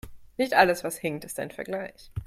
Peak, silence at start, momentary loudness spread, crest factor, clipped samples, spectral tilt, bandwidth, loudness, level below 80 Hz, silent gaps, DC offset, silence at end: -6 dBFS; 0.05 s; 15 LU; 22 dB; under 0.1%; -4 dB/octave; 16 kHz; -27 LUFS; -52 dBFS; none; under 0.1%; 0 s